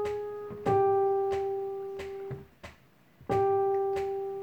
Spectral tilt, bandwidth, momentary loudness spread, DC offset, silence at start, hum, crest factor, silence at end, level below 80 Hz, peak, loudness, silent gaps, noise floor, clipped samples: -7.5 dB/octave; 8.4 kHz; 19 LU; under 0.1%; 0 s; none; 16 dB; 0 s; -60 dBFS; -14 dBFS; -30 LUFS; none; -60 dBFS; under 0.1%